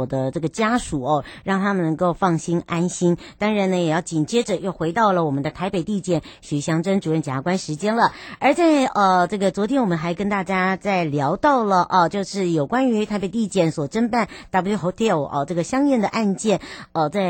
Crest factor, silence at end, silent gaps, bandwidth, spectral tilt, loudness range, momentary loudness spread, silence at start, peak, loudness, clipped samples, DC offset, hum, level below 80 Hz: 16 dB; 0 s; none; 16.5 kHz; -6 dB/octave; 3 LU; 6 LU; 0 s; -4 dBFS; -21 LUFS; under 0.1%; under 0.1%; none; -50 dBFS